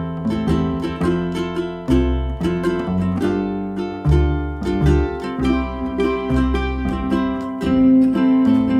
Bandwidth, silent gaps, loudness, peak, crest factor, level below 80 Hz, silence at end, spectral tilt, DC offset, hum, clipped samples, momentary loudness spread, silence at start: 9.8 kHz; none; -19 LUFS; -4 dBFS; 14 dB; -26 dBFS; 0 s; -8 dB/octave; under 0.1%; none; under 0.1%; 8 LU; 0 s